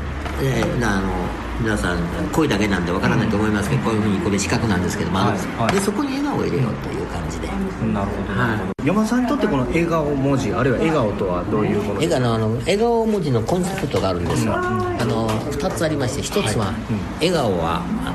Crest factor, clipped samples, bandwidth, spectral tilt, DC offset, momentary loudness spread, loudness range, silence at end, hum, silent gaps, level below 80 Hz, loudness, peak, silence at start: 16 dB; under 0.1%; 14 kHz; -6 dB/octave; under 0.1%; 5 LU; 2 LU; 0 s; none; none; -34 dBFS; -20 LUFS; -4 dBFS; 0 s